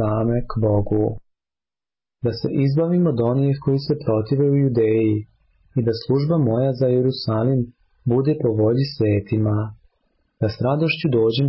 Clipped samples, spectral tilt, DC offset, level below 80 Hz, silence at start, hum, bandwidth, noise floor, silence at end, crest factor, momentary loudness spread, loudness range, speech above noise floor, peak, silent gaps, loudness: under 0.1%; -12.5 dB/octave; under 0.1%; -46 dBFS; 0 s; none; 5.8 kHz; under -90 dBFS; 0 s; 12 dB; 7 LU; 2 LU; over 71 dB; -8 dBFS; none; -20 LUFS